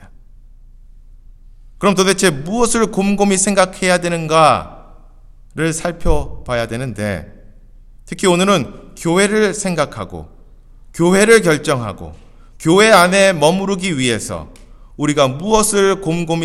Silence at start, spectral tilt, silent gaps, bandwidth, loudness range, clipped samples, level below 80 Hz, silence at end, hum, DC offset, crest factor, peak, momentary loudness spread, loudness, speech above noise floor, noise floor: 0 s; -4 dB/octave; none; 16.5 kHz; 6 LU; under 0.1%; -34 dBFS; 0 s; none; under 0.1%; 16 dB; 0 dBFS; 16 LU; -14 LUFS; 26 dB; -41 dBFS